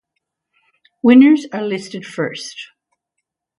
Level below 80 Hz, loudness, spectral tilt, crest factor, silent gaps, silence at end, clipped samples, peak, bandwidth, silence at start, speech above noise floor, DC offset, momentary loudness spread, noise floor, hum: -66 dBFS; -14 LUFS; -5.5 dB/octave; 18 dB; none; 0.95 s; under 0.1%; 0 dBFS; 11 kHz; 1.05 s; 63 dB; under 0.1%; 20 LU; -78 dBFS; none